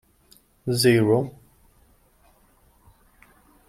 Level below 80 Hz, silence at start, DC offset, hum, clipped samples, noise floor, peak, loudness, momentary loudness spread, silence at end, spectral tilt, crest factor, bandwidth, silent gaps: -58 dBFS; 0.65 s; under 0.1%; none; under 0.1%; -59 dBFS; -6 dBFS; -21 LUFS; 17 LU; 2.4 s; -5.5 dB/octave; 20 dB; 16 kHz; none